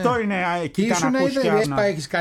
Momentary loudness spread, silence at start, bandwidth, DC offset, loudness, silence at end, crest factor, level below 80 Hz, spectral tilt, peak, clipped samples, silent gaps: 3 LU; 0 s; 15 kHz; under 0.1%; -21 LUFS; 0 s; 14 dB; -54 dBFS; -5 dB/octave; -6 dBFS; under 0.1%; none